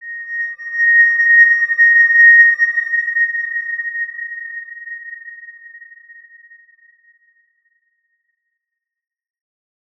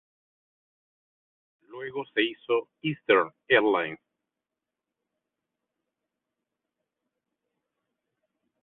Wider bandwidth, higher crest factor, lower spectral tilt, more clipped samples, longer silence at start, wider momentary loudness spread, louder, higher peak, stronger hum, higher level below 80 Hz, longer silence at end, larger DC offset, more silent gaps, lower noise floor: first, 6 kHz vs 4.2 kHz; second, 16 dB vs 24 dB; second, 2.5 dB/octave vs -8.5 dB/octave; neither; second, 0 s vs 1.7 s; first, 23 LU vs 14 LU; first, -11 LUFS vs -26 LUFS; first, 0 dBFS vs -8 dBFS; neither; about the same, -80 dBFS vs -76 dBFS; second, 4.15 s vs 4.7 s; neither; neither; second, -82 dBFS vs -88 dBFS